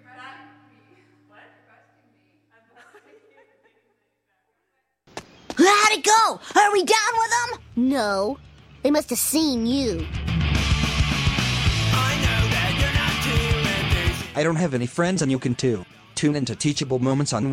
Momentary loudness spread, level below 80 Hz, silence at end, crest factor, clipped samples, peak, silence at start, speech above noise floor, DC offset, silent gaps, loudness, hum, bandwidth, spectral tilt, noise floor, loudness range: 11 LU; -34 dBFS; 0 s; 20 dB; under 0.1%; -4 dBFS; 0.15 s; 52 dB; under 0.1%; none; -21 LUFS; none; 16 kHz; -4 dB/octave; -74 dBFS; 4 LU